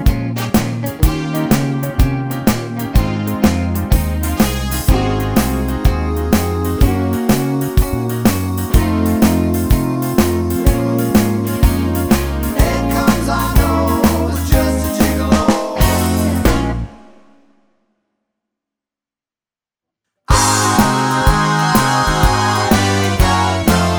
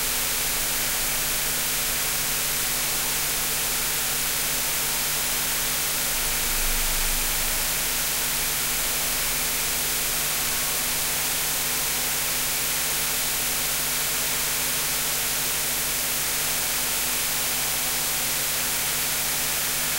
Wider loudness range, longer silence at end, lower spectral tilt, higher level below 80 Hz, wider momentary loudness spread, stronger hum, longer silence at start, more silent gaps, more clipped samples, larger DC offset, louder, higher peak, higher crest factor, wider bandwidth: first, 4 LU vs 0 LU; about the same, 0 s vs 0 s; first, -5.5 dB/octave vs 0 dB/octave; first, -22 dBFS vs -40 dBFS; first, 4 LU vs 0 LU; neither; about the same, 0 s vs 0 s; neither; neither; neither; first, -15 LUFS vs -22 LUFS; first, 0 dBFS vs -10 dBFS; about the same, 14 dB vs 14 dB; first, over 20 kHz vs 16 kHz